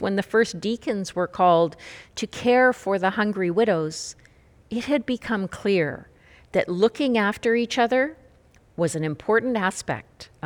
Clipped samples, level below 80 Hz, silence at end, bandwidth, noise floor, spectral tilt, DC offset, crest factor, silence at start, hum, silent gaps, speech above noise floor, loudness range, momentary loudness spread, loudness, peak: under 0.1%; -58 dBFS; 0.2 s; 16.5 kHz; -55 dBFS; -5 dB/octave; under 0.1%; 18 dB; 0 s; none; none; 32 dB; 4 LU; 13 LU; -23 LUFS; -6 dBFS